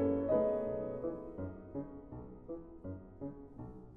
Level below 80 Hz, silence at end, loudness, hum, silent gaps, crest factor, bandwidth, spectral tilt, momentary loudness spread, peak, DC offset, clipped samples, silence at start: -60 dBFS; 0 s; -39 LUFS; none; none; 18 dB; 3.6 kHz; -11.5 dB/octave; 18 LU; -22 dBFS; under 0.1%; under 0.1%; 0 s